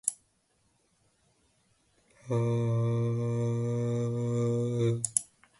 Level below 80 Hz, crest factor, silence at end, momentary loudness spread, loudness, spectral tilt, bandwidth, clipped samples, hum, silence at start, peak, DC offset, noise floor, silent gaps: -66 dBFS; 26 dB; 0.35 s; 3 LU; -30 LUFS; -6.5 dB/octave; 12 kHz; under 0.1%; none; 0.05 s; -6 dBFS; under 0.1%; -72 dBFS; none